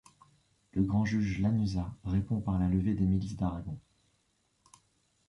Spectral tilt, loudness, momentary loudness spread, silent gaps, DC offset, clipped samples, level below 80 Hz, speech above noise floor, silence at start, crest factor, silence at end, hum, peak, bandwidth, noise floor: -8 dB/octave; -31 LUFS; 9 LU; none; under 0.1%; under 0.1%; -46 dBFS; 44 dB; 0.75 s; 16 dB; 1.5 s; none; -16 dBFS; 11 kHz; -74 dBFS